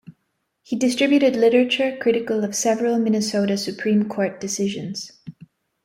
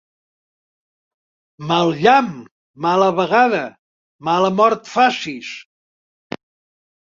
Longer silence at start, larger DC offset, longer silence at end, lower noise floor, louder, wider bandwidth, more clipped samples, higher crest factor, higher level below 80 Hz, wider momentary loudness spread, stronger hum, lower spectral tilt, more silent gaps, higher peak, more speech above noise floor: second, 0.1 s vs 1.6 s; neither; second, 0.55 s vs 1.4 s; second, -73 dBFS vs under -90 dBFS; second, -20 LUFS vs -16 LUFS; first, 15.5 kHz vs 7.6 kHz; neither; about the same, 16 dB vs 18 dB; about the same, -66 dBFS vs -62 dBFS; second, 10 LU vs 20 LU; neither; about the same, -4.5 dB/octave vs -5 dB/octave; second, none vs 2.51-2.74 s, 3.79-4.19 s; about the same, -4 dBFS vs -2 dBFS; second, 53 dB vs over 74 dB